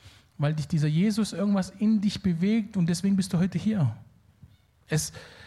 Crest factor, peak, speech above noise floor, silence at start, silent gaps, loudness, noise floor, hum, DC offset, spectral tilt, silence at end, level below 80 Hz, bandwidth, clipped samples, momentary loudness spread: 14 dB; -12 dBFS; 30 dB; 0.05 s; none; -26 LUFS; -56 dBFS; none; under 0.1%; -6.5 dB/octave; 0 s; -58 dBFS; 13.5 kHz; under 0.1%; 5 LU